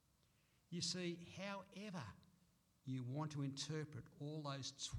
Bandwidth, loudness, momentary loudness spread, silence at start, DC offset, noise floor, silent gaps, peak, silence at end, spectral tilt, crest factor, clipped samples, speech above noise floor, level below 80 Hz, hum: 14 kHz; -48 LUFS; 9 LU; 0.7 s; under 0.1%; -78 dBFS; none; -32 dBFS; 0 s; -4.5 dB/octave; 18 dB; under 0.1%; 30 dB; -78 dBFS; none